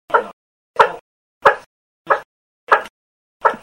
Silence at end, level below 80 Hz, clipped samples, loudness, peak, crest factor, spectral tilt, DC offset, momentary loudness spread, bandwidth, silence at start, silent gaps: 0.05 s; -62 dBFS; under 0.1%; -18 LUFS; 0 dBFS; 20 dB; -3.5 dB/octave; under 0.1%; 16 LU; 16 kHz; 0.1 s; 0.33-0.74 s, 1.01-1.41 s, 1.66-2.05 s, 2.25-2.67 s, 2.90-3.40 s